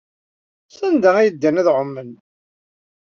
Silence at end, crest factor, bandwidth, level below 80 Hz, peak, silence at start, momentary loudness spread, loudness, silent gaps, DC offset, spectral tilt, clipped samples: 1.05 s; 18 dB; 7 kHz; -68 dBFS; -2 dBFS; 0.8 s; 13 LU; -16 LUFS; none; under 0.1%; -6.5 dB/octave; under 0.1%